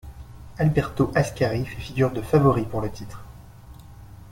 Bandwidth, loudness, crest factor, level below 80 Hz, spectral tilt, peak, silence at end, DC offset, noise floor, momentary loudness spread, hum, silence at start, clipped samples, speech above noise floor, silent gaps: 16.5 kHz; -23 LUFS; 20 dB; -42 dBFS; -7.5 dB/octave; -6 dBFS; 0 s; under 0.1%; -44 dBFS; 23 LU; none; 0.05 s; under 0.1%; 22 dB; none